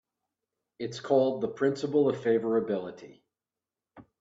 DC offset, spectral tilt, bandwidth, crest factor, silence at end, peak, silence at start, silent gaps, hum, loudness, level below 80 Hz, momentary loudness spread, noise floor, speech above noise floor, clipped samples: under 0.1%; -6.5 dB/octave; 7.8 kHz; 18 dB; 0.2 s; -12 dBFS; 0.8 s; none; none; -28 LUFS; -74 dBFS; 12 LU; under -90 dBFS; over 62 dB; under 0.1%